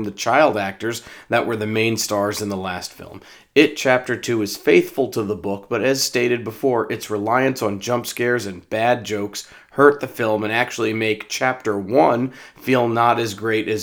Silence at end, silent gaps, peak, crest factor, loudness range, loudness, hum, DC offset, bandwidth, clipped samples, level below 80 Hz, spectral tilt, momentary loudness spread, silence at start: 0 s; none; 0 dBFS; 20 dB; 2 LU; -20 LUFS; none; under 0.1%; over 20 kHz; under 0.1%; -62 dBFS; -4.5 dB/octave; 10 LU; 0 s